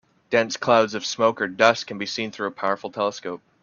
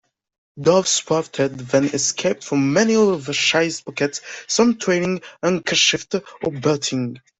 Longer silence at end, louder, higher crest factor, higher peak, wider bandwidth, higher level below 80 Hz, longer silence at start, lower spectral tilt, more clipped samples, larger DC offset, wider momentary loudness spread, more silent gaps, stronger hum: about the same, 0.25 s vs 0.2 s; second, -22 LUFS vs -19 LUFS; about the same, 22 dB vs 18 dB; about the same, 0 dBFS vs -2 dBFS; second, 7.2 kHz vs 8.4 kHz; second, -68 dBFS vs -60 dBFS; second, 0.3 s vs 0.55 s; about the same, -3.5 dB/octave vs -3.5 dB/octave; neither; neither; about the same, 9 LU vs 8 LU; neither; neither